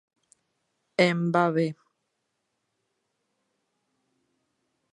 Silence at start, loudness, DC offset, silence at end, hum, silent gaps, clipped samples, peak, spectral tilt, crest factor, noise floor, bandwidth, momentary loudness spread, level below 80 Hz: 1 s; -25 LUFS; under 0.1%; 3.2 s; none; none; under 0.1%; -6 dBFS; -6.5 dB/octave; 24 dB; -79 dBFS; 10.5 kHz; 9 LU; -80 dBFS